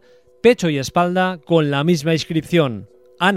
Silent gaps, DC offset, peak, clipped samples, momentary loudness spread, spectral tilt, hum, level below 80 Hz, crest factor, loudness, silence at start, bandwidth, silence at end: none; 0.1%; -2 dBFS; under 0.1%; 5 LU; -6 dB/octave; none; -54 dBFS; 16 dB; -18 LUFS; 0.45 s; 15 kHz; 0 s